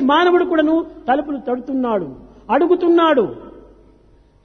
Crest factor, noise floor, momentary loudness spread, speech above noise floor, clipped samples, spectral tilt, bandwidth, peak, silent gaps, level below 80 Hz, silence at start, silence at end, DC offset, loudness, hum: 14 dB; -51 dBFS; 10 LU; 35 dB; under 0.1%; -6.5 dB/octave; 6.4 kHz; -2 dBFS; none; -50 dBFS; 0 s; 0.85 s; under 0.1%; -17 LUFS; 50 Hz at -50 dBFS